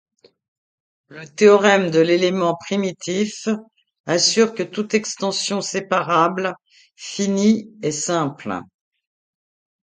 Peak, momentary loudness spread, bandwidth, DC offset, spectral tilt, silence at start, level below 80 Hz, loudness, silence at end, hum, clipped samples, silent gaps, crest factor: -2 dBFS; 14 LU; 9.6 kHz; under 0.1%; -4 dB/octave; 1.1 s; -66 dBFS; -19 LUFS; 1.3 s; none; under 0.1%; 4.00-4.04 s; 20 dB